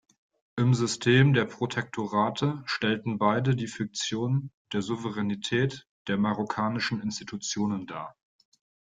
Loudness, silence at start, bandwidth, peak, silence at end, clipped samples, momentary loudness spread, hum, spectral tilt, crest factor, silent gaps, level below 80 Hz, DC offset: -28 LUFS; 0.55 s; 9.4 kHz; -8 dBFS; 0.85 s; under 0.1%; 11 LU; none; -5.5 dB/octave; 20 dB; 4.54-4.65 s, 5.89-6.05 s; -64 dBFS; under 0.1%